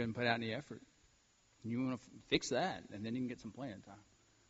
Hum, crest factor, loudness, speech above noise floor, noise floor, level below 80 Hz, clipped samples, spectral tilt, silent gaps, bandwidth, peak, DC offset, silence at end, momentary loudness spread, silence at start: none; 26 dB; -40 LUFS; 32 dB; -72 dBFS; -72 dBFS; under 0.1%; -3.5 dB/octave; none; 8 kHz; -16 dBFS; under 0.1%; 0.5 s; 18 LU; 0 s